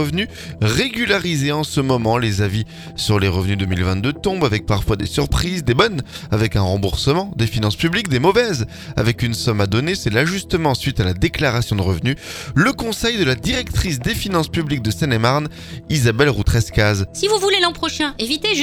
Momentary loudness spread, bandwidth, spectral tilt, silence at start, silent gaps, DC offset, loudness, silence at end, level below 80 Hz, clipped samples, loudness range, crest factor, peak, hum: 5 LU; 19 kHz; -5 dB/octave; 0 s; none; under 0.1%; -18 LUFS; 0 s; -32 dBFS; under 0.1%; 2 LU; 18 dB; 0 dBFS; none